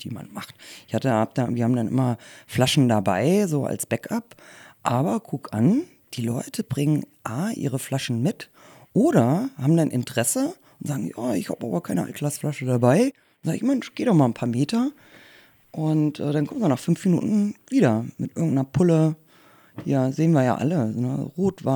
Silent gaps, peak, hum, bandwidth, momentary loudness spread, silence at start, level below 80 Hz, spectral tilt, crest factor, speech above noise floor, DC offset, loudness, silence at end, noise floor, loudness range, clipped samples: none; -4 dBFS; none; over 20 kHz; 11 LU; 0 s; -64 dBFS; -6.5 dB/octave; 20 dB; 31 dB; under 0.1%; -23 LUFS; 0 s; -54 dBFS; 3 LU; under 0.1%